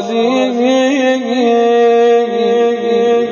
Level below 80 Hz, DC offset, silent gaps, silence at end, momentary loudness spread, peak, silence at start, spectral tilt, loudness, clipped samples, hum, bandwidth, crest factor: -62 dBFS; under 0.1%; none; 0 s; 4 LU; -2 dBFS; 0 s; -4.5 dB/octave; -12 LUFS; under 0.1%; none; 7.2 kHz; 10 dB